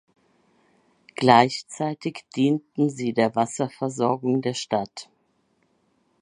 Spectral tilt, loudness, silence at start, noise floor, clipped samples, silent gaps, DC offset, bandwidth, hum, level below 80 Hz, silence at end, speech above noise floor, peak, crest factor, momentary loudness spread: -5.5 dB/octave; -23 LUFS; 1.2 s; -68 dBFS; under 0.1%; none; under 0.1%; 11 kHz; none; -68 dBFS; 1.2 s; 45 dB; 0 dBFS; 24 dB; 13 LU